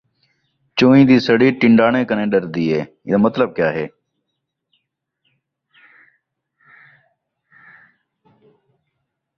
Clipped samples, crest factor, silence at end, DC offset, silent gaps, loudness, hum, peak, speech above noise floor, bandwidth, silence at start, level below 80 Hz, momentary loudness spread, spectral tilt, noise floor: under 0.1%; 18 dB; 5.5 s; under 0.1%; none; -15 LUFS; none; -2 dBFS; 62 dB; 6.6 kHz; 0.75 s; -58 dBFS; 11 LU; -7.5 dB/octave; -76 dBFS